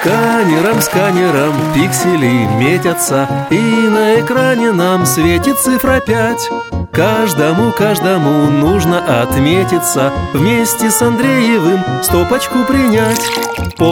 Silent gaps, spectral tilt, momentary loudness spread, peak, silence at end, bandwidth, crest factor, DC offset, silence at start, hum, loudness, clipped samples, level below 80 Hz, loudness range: none; -5 dB/octave; 3 LU; 0 dBFS; 0 s; 17.5 kHz; 12 dB; under 0.1%; 0 s; none; -12 LUFS; under 0.1%; -34 dBFS; 1 LU